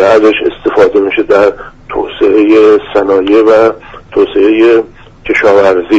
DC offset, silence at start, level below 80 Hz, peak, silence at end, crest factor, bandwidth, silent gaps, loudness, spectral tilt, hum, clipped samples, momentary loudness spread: under 0.1%; 0 s; -38 dBFS; 0 dBFS; 0 s; 8 dB; 8 kHz; none; -8 LUFS; -6 dB/octave; none; 0.3%; 12 LU